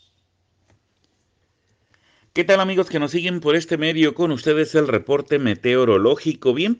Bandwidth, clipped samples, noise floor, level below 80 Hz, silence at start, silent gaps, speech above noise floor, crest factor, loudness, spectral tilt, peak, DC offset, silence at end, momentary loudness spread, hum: 9.4 kHz; under 0.1%; -67 dBFS; -64 dBFS; 2.35 s; none; 49 dB; 16 dB; -19 LUFS; -6 dB/octave; -4 dBFS; under 0.1%; 0.05 s; 5 LU; none